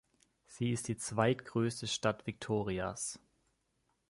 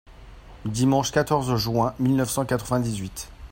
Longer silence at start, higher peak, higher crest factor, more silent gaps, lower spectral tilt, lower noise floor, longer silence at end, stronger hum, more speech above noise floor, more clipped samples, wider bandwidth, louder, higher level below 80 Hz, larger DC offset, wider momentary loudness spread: first, 0.5 s vs 0.1 s; second, -14 dBFS vs -6 dBFS; about the same, 22 dB vs 18 dB; neither; about the same, -4.5 dB/octave vs -5.5 dB/octave; first, -79 dBFS vs -44 dBFS; first, 0.9 s vs 0.05 s; neither; first, 44 dB vs 21 dB; neither; second, 11.5 kHz vs 16.5 kHz; second, -36 LUFS vs -24 LUFS; second, -64 dBFS vs -46 dBFS; neither; about the same, 9 LU vs 11 LU